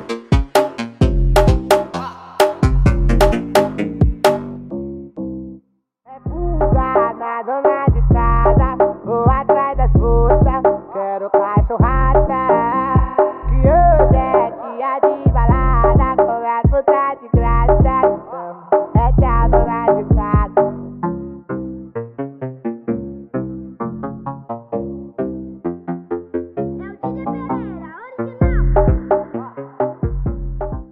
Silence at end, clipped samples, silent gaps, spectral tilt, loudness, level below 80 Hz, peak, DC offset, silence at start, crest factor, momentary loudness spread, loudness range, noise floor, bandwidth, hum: 0.1 s; under 0.1%; none; -8 dB/octave; -17 LUFS; -20 dBFS; 0 dBFS; under 0.1%; 0 s; 16 dB; 14 LU; 11 LU; -56 dBFS; 14.5 kHz; none